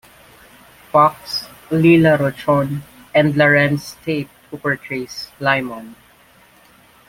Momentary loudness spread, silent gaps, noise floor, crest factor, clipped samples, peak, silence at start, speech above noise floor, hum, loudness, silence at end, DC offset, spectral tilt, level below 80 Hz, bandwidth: 14 LU; none; -50 dBFS; 16 dB; under 0.1%; -2 dBFS; 0.95 s; 33 dB; none; -17 LUFS; 1.15 s; under 0.1%; -6.5 dB/octave; -52 dBFS; 16.5 kHz